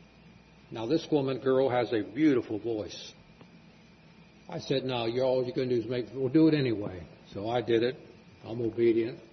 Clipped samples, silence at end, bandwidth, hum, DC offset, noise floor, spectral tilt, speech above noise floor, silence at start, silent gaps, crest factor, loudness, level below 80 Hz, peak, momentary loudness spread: under 0.1%; 0.05 s; 6.4 kHz; none; under 0.1%; -56 dBFS; -7 dB/octave; 27 dB; 0.7 s; none; 16 dB; -29 LUFS; -66 dBFS; -14 dBFS; 16 LU